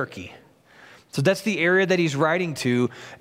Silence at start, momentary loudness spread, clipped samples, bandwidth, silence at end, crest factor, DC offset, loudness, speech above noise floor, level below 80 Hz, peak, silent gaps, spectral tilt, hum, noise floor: 0 s; 13 LU; under 0.1%; 16 kHz; 0.05 s; 18 dB; under 0.1%; -22 LUFS; 29 dB; -66 dBFS; -6 dBFS; none; -5.5 dB/octave; none; -51 dBFS